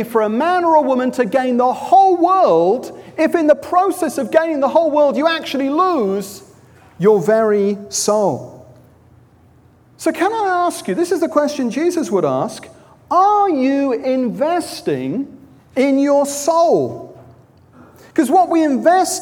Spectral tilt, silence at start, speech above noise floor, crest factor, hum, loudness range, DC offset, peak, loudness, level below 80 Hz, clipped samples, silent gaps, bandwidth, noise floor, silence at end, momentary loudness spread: -4.5 dB/octave; 0 s; 34 dB; 16 dB; none; 5 LU; under 0.1%; -2 dBFS; -16 LUFS; -62 dBFS; under 0.1%; none; 18 kHz; -49 dBFS; 0 s; 9 LU